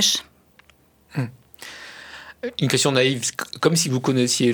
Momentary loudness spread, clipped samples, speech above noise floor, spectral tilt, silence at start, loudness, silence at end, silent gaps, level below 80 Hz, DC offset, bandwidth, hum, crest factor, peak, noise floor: 20 LU; under 0.1%; 36 dB; -3.5 dB/octave; 0 s; -21 LUFS; 0 s; none; -64 dBFS; under 0.1%; over 20 kHz; none; 22 dB; -2 dBFS; -57 dBFS